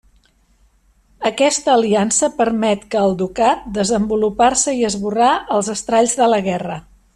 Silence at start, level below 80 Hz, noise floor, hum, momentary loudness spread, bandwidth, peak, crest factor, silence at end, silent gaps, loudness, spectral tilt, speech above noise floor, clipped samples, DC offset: 1.2 s; -48 dBFS; -56 dBFS; none; 6 LU; 12.5 kHz; -2 dBFS; 14 dB; 0.35 s; none; -16 LUFS; -3.5 dB/octave; 40 dB; under 0.1%; under 0.1%